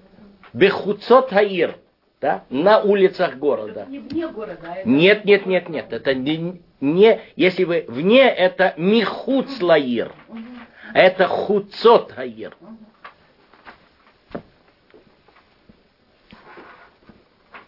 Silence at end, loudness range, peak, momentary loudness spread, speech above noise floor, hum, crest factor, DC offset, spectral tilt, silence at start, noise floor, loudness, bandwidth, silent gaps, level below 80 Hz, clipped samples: 0.1 s; 3 LU; 0 dBFS; 19 LU; 40 dB; none; 18 dB; under 0.1%; -8 dB/octave; 0.55 s; -58 dBFS; -18 LUFS; 5.8 kHz; none; -62 dBFS; under 0.1%